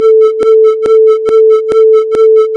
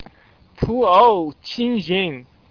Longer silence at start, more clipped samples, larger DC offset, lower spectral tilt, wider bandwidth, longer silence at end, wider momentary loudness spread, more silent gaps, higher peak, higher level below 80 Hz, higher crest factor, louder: about the same, 0 s vs 0 s; neither; neither; second, -5 dB/octave vs -7 dB/octave; first, 6 kHz vs 5.4 kHz; second, 0 s vs 0.3 s; second, 0 LU vs 14 LU; neither; about the same, -2 dBFS vs -2 dBFS; second, -52 dBFS vs -44 dBFS; second, 6 dB vs 18 dB; first, -7 LUFS vs -18 LUFS